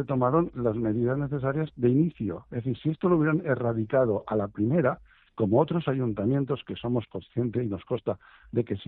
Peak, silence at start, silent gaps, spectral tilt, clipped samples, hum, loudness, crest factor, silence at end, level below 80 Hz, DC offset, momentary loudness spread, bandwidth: -10 dBFS; 0 s; none; -8 dB/octave; under 0.1%; none; -27 LUFS; 18 dB; 0.05 s; -56 dBFS; under 0.1%; 8 LU; 4.1 kHz